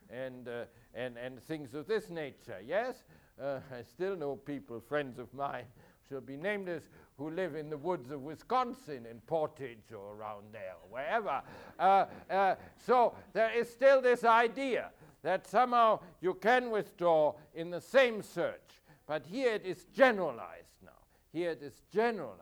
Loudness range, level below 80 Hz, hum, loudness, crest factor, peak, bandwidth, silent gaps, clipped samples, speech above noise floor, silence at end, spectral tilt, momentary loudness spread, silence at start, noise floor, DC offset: 11 LU; -70 dBFS; none; -33 LUFS; 22 dB; -12 dBFS; over 20 kHz; none; under 0.1%; 29 dB; 0.05 s; -5.5 dB/octave; 18 LU; 0.1 s; -62 dBFS; under 0.1%